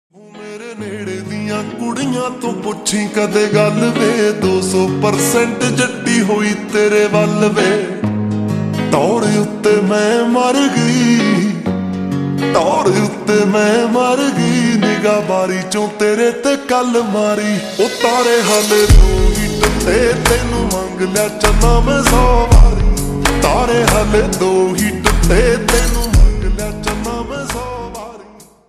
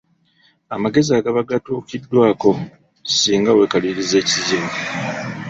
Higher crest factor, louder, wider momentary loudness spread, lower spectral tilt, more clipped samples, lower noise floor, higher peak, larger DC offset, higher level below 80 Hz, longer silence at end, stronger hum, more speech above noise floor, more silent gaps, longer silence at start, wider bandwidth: about the same, 14 dB vs 16 dB; first, -14 LUFS vs -17 LUFS; about the same, 9 LU vs 11 LU; about the same, -5 dB/octave vs -4 dB/octave; neither; second, -40 dBFS vs -58 dBFS; about the same, 0 dBFS vs -2 dBFS; neither; first, -20 dBFS vs -56 dBFS; first, 0.25 s vs 0 s; neither; second, 27 dB vs 41 dB; neither; second, 0.35 s vs 0.7 s; first, 14.5 kHz vs 8 kHz